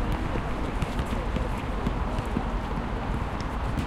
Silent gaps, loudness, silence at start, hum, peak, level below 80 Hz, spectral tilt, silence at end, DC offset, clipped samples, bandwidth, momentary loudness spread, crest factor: none; -30 LUFS; 0 s; none; -12 dBFS; -32 dBFS; -7 dB/octave; 0 s; under 0.1%; under 0.1%; 13 kHz; 2 LU; 16 dB